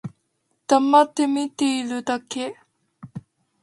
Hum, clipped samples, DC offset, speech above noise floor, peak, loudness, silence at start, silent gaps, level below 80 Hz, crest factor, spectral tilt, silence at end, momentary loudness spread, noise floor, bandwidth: none; under 0.1%; under 0.1%; 51 dB; -2 dBFS; -21 LUFS; 0.05 s; none; -70 dBFS; 20 dB; -4 dB/octave; 0.4 s; 24 LU; -72 dBFS; 11.5 kHz